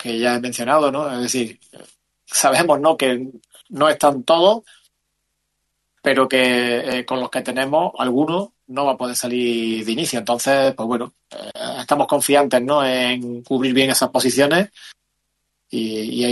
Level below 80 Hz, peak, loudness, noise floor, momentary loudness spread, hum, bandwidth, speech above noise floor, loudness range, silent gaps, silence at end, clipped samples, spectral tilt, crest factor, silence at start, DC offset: -64 dBFS; -2 dBFS; -18 LUFS; -73 dBFS; 11 LU; none; 12.5 kHz; 55 dB; 3 LU; none; 0 s; under 0.1%; -3 dB/octave; 18 dB; 0 s; under 0.1%